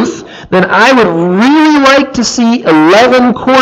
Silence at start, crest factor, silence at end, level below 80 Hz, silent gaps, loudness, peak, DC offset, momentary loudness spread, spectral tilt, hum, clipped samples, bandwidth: 0 s; 6 dB; 0 s; -42 dBFS; none; -7 LUFS; 0 dBFS; under 0.1%; 7 LU; -4.5 dB/octave; none; 0.4%; 12.5 kHz